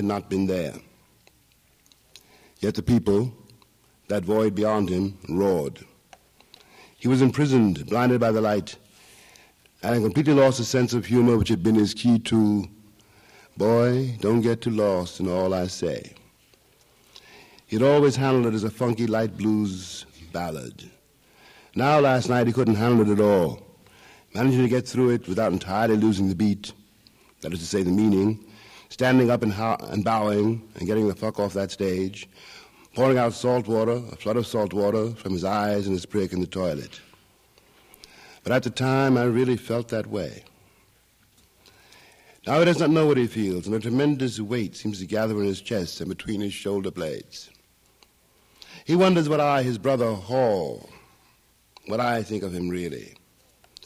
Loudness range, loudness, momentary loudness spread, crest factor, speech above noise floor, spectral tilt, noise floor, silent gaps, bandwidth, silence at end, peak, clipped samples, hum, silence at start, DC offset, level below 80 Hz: 6 LU; -23 LUFS; 13 LU; 16 dB; 39 dB; -6.5 dB/octave; -61 dBFS; none; 15.5 kHz; 0.75 s; -8 dBFS; under 0.1%; none; 0 s; under 0.1%; -58 dBFS